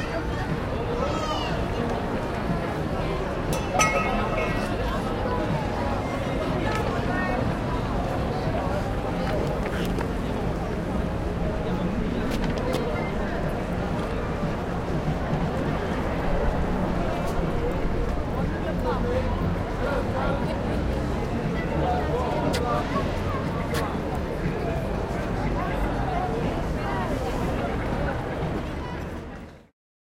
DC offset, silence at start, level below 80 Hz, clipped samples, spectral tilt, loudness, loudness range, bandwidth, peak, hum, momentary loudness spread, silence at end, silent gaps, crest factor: under 0.1%; 0 s; -34 dBFS; under 0.1%; -6.5 dB/octave; -27 LUFS; 2 LU; 16.5 kHz; -8 dBFS; none; 3 LU; 0.5 s; none; 18 dB